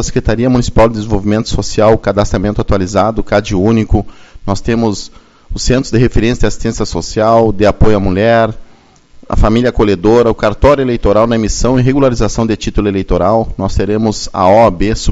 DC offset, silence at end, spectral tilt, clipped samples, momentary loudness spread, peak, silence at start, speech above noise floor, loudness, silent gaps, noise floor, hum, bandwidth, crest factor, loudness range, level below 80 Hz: under 0.1%; 0 s; -6 dB/octave; 0.5%; 7 LU; 0 dBFS; 0 s; 32 dB; -12 LUFS; none; -42 dBFS; none; 8 kHz; 10 dB; 3 LU; -22 dBFS